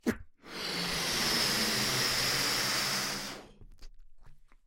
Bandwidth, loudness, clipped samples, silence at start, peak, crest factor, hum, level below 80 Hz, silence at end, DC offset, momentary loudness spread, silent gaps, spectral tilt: 16.5 kHz; -29 LUFS; under 0.1%; 0.05 s; -16 dBFS; 18 dB; none; -54 dBFS; 0.25 s; under 0.1%; 14 LU; none; -1.5 dB/octave